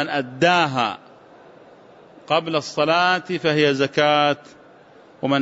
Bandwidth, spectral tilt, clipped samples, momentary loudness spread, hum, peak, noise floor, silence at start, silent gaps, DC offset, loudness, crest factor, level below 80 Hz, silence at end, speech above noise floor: 8 kHz; -5 dB/octave; under 0.1%; 8 LU; none; -4 dBFS; -48 dBFS; 0 s; none; under 0.1%; -20 LUFS; 18 dB; -66 dBFS; 0 s; 29 dB